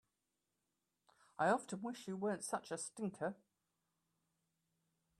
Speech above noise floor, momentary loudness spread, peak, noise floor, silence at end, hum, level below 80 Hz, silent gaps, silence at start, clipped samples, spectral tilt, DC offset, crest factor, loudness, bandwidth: 47 dB; 10 LU; -22 dBFS; -89 dBFS; 1.85 s; none; -88 dBFS; none; 1.4 s; under 0.1%; -4.5 dB/octave; under 0.1%; 22 dB; -42 LUFS; 13.5 kHz